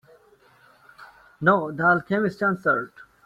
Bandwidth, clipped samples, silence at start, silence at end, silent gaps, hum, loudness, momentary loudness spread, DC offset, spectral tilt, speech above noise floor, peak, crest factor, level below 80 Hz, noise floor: 11.5 kHz; under 0.1%; 1 s; 0.4 s; none; none; -22 LUFS; 5 LU; under 0.1%; -8 dB/octave; 34 dB; -4 dBFS; 20 dB; -64 dBFS; -57 dBFS